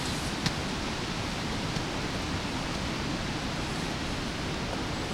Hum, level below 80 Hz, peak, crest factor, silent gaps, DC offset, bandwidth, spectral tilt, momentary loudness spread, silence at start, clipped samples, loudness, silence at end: none; -42 dBFS; -12 dBFS; 20 dB; none; under 0.1%; 16.5 kHz; -4 dB/octave; 2 LU; 0 s; under 0.1%; -32 LUFS; 0 s